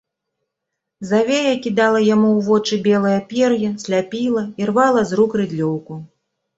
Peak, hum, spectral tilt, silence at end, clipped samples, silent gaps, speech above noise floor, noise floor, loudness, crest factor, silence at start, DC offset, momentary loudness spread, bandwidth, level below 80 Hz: -2 dBFS; none; -5.5 dB/octave; 0.5 s; under 0.1%; none; 63 dB; -80 dBFS; -17 LUFS; 16 dB; 1 s; under 0.1%; 7 LU; 8 kHz; -60 dBFS